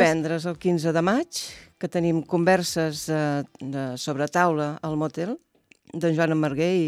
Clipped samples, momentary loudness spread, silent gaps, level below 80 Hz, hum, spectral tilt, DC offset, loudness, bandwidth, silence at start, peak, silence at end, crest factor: under 0.1%; 11 LU; none; -62 dBFS; none; -5.5 dB/octave; under 0.1%; -25 LUFS; 15 kHz; 0 s; -6 dBFS; 0 s; 18 dB